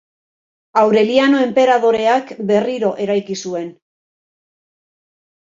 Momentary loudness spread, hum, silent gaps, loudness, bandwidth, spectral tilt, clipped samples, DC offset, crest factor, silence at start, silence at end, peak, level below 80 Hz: 11 LU; none; none; -15 LUFS; 7.8 kHz; -5 dB/octave; under 0.1%; under 0.1%; 16 dB; 0.75 s; 1.9 s; -2 dBFS; -64 dBFS